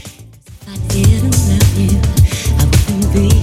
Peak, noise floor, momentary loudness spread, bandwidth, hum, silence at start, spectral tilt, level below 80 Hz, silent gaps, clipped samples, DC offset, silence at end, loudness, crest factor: 0 dBFS; -37 dBFS; 5 LU; 16 kHz; none; 0.05 s; -5.5 dB/octave; -18 dBFS; none; under 0.1%; under 0.1%; 0 s; -13 LUFS; 12 dB